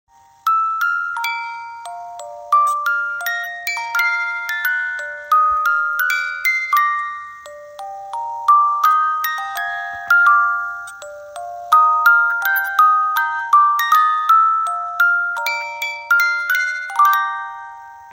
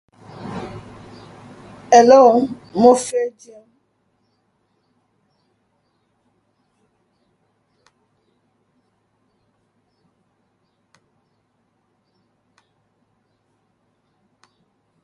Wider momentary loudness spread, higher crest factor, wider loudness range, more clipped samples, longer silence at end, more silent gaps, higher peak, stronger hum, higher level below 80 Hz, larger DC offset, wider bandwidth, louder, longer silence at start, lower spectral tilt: second, 18 LU vs 32 LU; second, 16 dB vs 22 dB; second, 5 LU vs 10 LU; neither; second, 0 s vs 11.75 s; neither; about the same, -2 dBFS vs 0 dBFS; neither; about the same, -64 dBFS vs -62 dBFS; neither; first, 16.5 kHz vs 11.5 kHz; about the same, -16 LUFS vs -14 LUFS; about the same, 0.45 s vs 0.4 s; second, 2 dB/octave vs -4.5 dB/octave